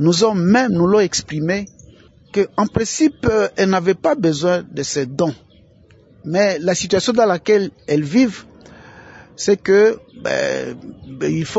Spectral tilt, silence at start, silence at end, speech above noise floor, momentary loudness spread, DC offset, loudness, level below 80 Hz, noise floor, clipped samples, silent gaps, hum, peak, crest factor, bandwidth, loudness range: -5 dB/octave; 0 s; 0 s; 32 dB; 10 LU; under 0.1%; -17 LUFS; -48 dBFS; -49 dBFS; under 0.1%; none; none; -2 dBFS; 16 dB; 8 kHz; 2 LU